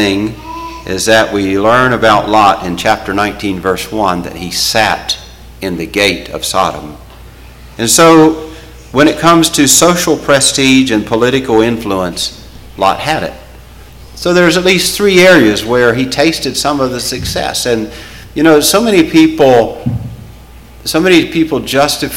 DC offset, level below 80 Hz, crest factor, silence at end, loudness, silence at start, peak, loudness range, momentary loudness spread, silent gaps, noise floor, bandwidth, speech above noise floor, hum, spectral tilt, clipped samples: under 0.1%; -36 dBFS; 10 dB; 0 s; -10 LUFS; 0 s; 0 dBFS; 5 LU; 13 LU; none; -34 dBFS; 17 kHz; 24 dB; none; -3.5 dB/octave; under 0.1%